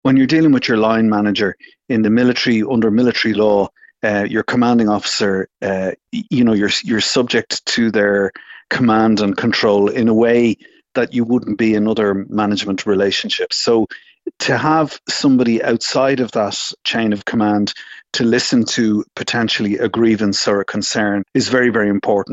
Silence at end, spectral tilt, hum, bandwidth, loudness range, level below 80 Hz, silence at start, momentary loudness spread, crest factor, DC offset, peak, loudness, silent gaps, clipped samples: 0 s; -4.5 dB/octave; none; 8.2 kHz; 2 LU; -54 dBFS; 0.05 s; 7 LU; 14 dB; under 0.1%; 0 dBFS; -16 LUFS; none; under 0.1%